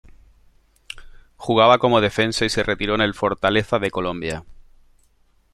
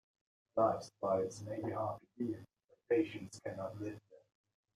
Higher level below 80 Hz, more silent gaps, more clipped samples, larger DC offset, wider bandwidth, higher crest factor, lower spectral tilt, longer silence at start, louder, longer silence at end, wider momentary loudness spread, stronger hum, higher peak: first, -44 dBFS vs -76 dBFS; second, none vs 2.64-2.68 s; neither; neither; about the same, 13 kHz vs 13.5 kHz; about the same, 20 dB vs 20 dB; second, -5 dB/octave vs -6.5 dB/octave; first, 0.95 s vs 0.55 s; first, -19 LUFS vs -39 LUFS; first, 1 s vs 0.6 s; first, 21 LU vs 12 LU; neither; first, -2 dBFS vs -20 dBFS